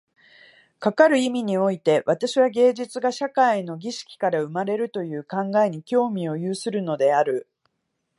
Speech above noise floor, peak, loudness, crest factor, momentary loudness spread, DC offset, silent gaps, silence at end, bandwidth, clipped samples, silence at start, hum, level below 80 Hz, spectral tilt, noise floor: 55 dB; -4 dBFS; -22 LUFS; 18 dB; 10 LU; under 0.1%; none; 0.8 s; 11.5 kHz; under 0.1%; 0.8 s; none; -78 dBFS; -5.5 dB/octave; -76 dBFS